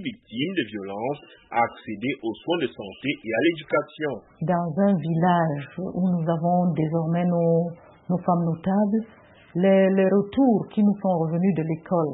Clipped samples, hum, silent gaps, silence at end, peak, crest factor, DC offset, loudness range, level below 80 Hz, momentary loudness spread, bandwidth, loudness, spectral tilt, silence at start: under 0.1%; none; none; 0 s; -8 dBFS; 16 dB; under 0.1%; 5 LU; -62 dBFS; 10 LU; 4 kHz; -24 LUFS; -12 dB/octave; 0 s